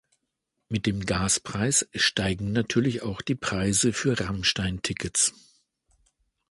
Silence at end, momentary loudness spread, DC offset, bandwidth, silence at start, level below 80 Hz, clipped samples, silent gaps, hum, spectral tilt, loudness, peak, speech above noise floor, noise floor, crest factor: 1.2 s; 6 LU; under 0.1%; 11.5 kHz; 0.7 s; -48 dBFS; under 0.1%; none; none; -3.5 dB/octave; -25 LUFS; -8 dBFS; 54 dB; -80 dBFS; 18 dB